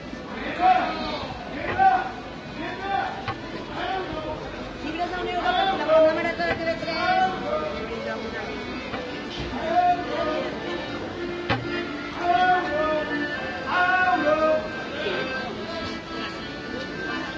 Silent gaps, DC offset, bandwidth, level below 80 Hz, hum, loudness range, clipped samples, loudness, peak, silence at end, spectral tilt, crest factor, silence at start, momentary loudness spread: none; under 0.1%; 8 kHz; -48 dBFS; none; 4 LU; under 0.1%; -25 LUFS; -8 dBFS; 0 s; -5.5 dB/octave; 18 dB; 0 s; 12 LU